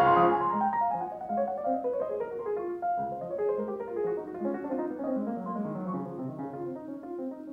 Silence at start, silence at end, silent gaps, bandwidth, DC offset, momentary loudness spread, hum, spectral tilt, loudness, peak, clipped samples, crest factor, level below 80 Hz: 0 s; 0 s; none; 5.2 kHz; under 0.1%; 10 LU; none; -9 dB/octave; -31 LUFS; -12 dBFS; under 0.1%; 18 dB; -66 dBFS